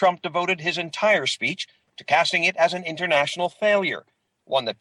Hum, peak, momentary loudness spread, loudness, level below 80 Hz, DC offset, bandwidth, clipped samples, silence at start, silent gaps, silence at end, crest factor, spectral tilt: none; -8 dBFS; 8 LU; -22 LUFS; -70 dBFS; under 0.1%; 11 kHz; under 0.1%; 0 s; none; 0.05 s; 16 dB; -3 dB/octave